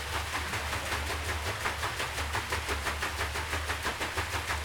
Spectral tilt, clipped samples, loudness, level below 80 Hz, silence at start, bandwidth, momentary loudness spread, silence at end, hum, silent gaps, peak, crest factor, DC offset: -3 dB/octave; under 0.1%; -32 LUFS; -42 dBFS; 0 s; over 20 kHz; 1 LU; 0 s; none; none; -18 dBFS; 16 dB; under 0.1%